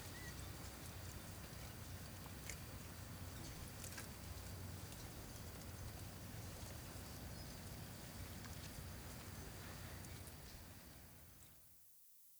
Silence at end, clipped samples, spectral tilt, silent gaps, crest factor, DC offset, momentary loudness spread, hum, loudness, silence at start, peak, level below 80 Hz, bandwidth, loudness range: 0 s; under 0.1%; -4 dB/octave; none; 22 dB; under 0.1%; 7 LU; none; -53 LUFS; 0 s; -30 dBFS; -60 dBFS; over 20 kHz; 2 LU